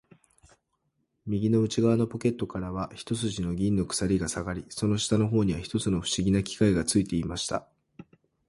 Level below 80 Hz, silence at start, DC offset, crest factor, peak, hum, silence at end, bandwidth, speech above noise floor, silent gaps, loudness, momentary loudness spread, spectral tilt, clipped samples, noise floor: -48 dBFS; 1.25 s; under 0.1%; 20 dB; -8 dBFS; none; 0.45 s; 11.5 kHz; 49 dB; none; -28 LUFS; 9 LU; -5.5 dB/octave; under 0.1%; -76 dBFS